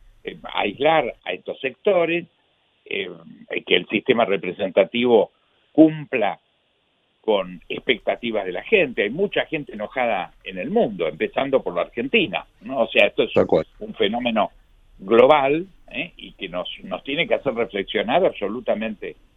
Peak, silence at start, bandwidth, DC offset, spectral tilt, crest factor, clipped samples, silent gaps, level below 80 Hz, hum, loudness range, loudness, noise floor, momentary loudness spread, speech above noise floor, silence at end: 0 dBFS; 0.25 s; 4.5 kHz; under 0.1%; -7.5 dB/octave; 22 dB; under 0.1%; none; -54 dBFS; none; 4 LU; -21 LUFS; -66 dBFS; 13 LU; 45 dB; 0.25 s